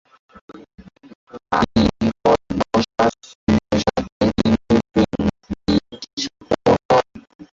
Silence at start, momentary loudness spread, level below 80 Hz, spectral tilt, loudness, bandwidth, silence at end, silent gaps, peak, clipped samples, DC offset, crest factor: 0.5 s; 10 LU; -38 dBFS; -6 dB/octave; -19 LUFS; 7.6 kHz; 0.15 s; 1.15-1.27 s, 3.35-3.47 s, 4.12-4.20 s, 6.13-6.17 s, 6.85-6.89 s, 7.35-7.39 s; -2 dBFS; under 0.1%; under 0.1%; 18 dB